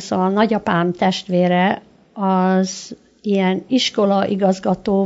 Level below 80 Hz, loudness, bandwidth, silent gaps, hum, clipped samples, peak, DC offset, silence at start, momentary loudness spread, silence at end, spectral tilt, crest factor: -56 dBFS; -18 LUFS; 7.8 kHz; none; none; under 0.1%; -2 dBFS; under 0.1%; 0 s; 8 LU; 0 s; -6 dB/octave; 16 dB